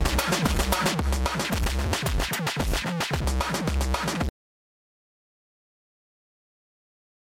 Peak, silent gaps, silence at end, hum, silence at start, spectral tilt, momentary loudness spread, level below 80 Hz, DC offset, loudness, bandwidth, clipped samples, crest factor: -10 dBFS; none; 3.1 s; none; 0 s; -4 dB/octave; 3 LU; -32 dBFS; under 0.1%; -26 LUFS; 17 kHz; under 0.1%; 18 dB